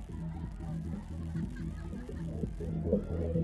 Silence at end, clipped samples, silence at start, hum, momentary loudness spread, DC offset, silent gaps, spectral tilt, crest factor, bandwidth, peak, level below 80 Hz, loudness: 0 s; under 0.1%; 0 s; none; 8 LU; under 0.1%; none; -9.5 dB/octave; 20 dB; 11.5 kHz; -16 dBFS; -44 dBFS; -38 LUFS